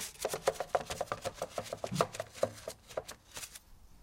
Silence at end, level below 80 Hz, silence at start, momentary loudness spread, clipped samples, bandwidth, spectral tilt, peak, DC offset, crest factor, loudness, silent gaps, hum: 0 s; -60 dBFS; 0 s; 11 LU; under 0.1%; 16 kHz; -3.5 dB/octave; -12 dBFS; under 0.1%; 28 dB; -38 LUFS; none; none